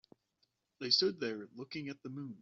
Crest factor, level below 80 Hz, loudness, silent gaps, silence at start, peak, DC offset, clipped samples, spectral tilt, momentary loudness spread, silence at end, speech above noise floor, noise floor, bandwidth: 24 dB; -82 dBFS; -36 LUFS; none; 0.8 s; -16 dBFS; under 0.1%; under 0.1%; -2.5 dB/octave; 16 LU; 0.05 s; 43 dB; -80 dBFS; 7.4 kHz